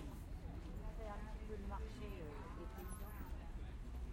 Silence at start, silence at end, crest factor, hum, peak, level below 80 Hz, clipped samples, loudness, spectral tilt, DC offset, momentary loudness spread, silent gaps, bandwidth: 0 s; 0 s; 12 dB; none; -36 dBFS; -50 dBFS; under 0.1%; -51 LUFS; -6.5 dB/octave; under 0.1%; 3 LU; none; 16.5 kHz